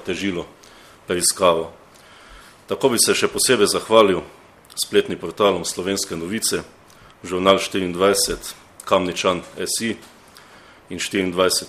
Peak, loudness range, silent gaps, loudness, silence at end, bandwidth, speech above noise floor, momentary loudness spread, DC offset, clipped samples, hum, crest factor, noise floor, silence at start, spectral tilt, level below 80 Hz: 0 dBFS; 4 LU; none; -19 LUFS; 0 s; 15.5 kHz; 27 dB; 15 LU; under 0.1%; under 0.1%; none; 22 dB; -47 dBFS; 0 s; -2.5 dB/octave; -52 dBFS